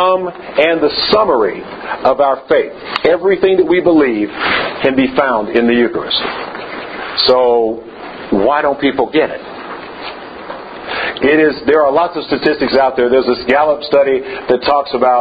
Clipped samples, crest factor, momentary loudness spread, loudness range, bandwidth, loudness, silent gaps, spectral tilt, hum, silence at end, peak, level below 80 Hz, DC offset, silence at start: under 0.1%; 14 dB; 15 LU; 3 LU; 5.2 kHz; -13 LUFS; none; -7 dB/octave; none; 0 s; 0 dBFS; -46 dBFS; under 0.1%; 0 s